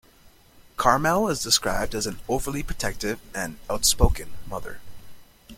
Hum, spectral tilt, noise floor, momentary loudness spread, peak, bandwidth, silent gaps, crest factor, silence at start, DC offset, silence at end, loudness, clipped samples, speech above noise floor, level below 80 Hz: none; -3 dB/octave; -54 dBFS; 16 LU; -2 dBFS; 16.5 kHz; none; 24 dB; 0.25 s; under 0.1%; 0 s; -24 LUFS; under 0.1%; 30 dB; -34 dBFS